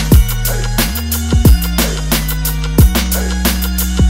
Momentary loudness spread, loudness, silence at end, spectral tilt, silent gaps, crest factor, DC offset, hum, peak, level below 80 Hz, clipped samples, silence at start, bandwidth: 5 LU; -14 LUFS; 0 s; -4.5 dB/octave; none; 12 dB; under 0.1%; none; 0 dBFS; -14 dBFS; under 0.1%; 0 s; 16.5 kHz